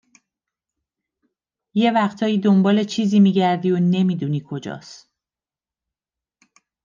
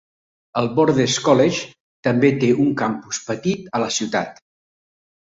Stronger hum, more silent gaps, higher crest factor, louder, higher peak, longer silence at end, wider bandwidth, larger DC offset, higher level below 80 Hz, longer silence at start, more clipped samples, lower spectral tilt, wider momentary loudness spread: neither; second, none vs 1.80-2.03 s; about the same, 16 dB vs 18 dB; about the same, -18 LUFS vs -19 LUFS; second, -6 dBFS vs -2 dBFS; first, 1.9 s vs 0.9 s; about the same, 7.4 kHz vs 8 kHz; neither; second, -72 dBFS vs -58 dBFS; first, 1.75 s vs 0.55 s; neither; first, -7 dB/octave vs -5 dB/octave; first, 14 LU vs 10 LU